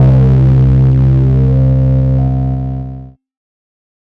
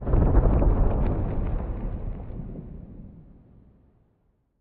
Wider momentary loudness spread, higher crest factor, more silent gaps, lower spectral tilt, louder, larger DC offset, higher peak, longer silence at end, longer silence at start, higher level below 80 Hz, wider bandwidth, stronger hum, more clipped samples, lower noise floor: second, 12 LU vs 21 LU; second, 8 dB vs 18 dB; neither; about the same, -11.5 dB/octave vs -11 dB/octave; first, -10 LUFS vs -27 LUFS; neither; first, -2 dBFS vs -8 dBFS; second, 0.95 s vs 1.4 s; about the same, 0 s vs 0 s; first, -20 dBFS vs -26 dBFS; about the same, 3 kHz vs 3 kHz; neither; neither; second, -29 dBFS vs -68 dBFS